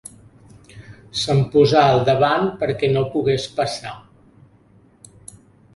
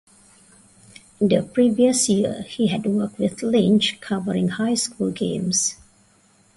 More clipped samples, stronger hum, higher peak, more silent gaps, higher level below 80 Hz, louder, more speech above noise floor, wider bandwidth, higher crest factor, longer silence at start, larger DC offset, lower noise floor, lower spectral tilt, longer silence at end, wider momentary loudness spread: neither; neither; first, -2 dBFS vs -6 dBFS; neither; first, -50 dBFS vs -58 dBFS; first, -18 LUFS vs -21 LUFS; about the same, 35 dB vs 37 dB; about the same, 11.5 kHz vs 11.5 kHz; about the same, 20 dB vs 16 dB; second, 0.75 s vs 1.2 s; neither; second, -53 dBFS vs -57 dBFS; first, -6 dB/octave vs -4.5 dB/octave; first, 1.75 s vs 0.8 s; first, 16 LU vs 8 LU